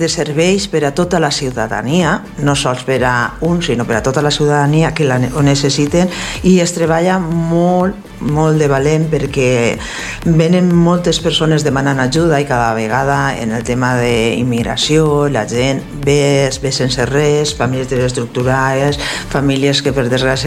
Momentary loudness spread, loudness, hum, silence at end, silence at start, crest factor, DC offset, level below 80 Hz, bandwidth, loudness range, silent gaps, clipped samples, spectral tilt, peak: 5 LU; -14 LUFS; none; 0 s; 0 s; 14 dB; under 0.1%; -34 dBFS; 15 kHz; 2 LU; none; under 0.1%; -5 dB/octave; 0 dBFS